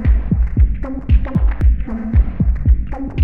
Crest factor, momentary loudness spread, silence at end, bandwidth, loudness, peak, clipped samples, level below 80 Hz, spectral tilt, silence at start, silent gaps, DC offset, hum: 12 dB; 4 LU; 0 s; 3.1 kHz; -18 LUFS; -2 dBFS; under 0.1%; -16 dBFS; -11 dB/octave; 0 s; none; under 0.1%; none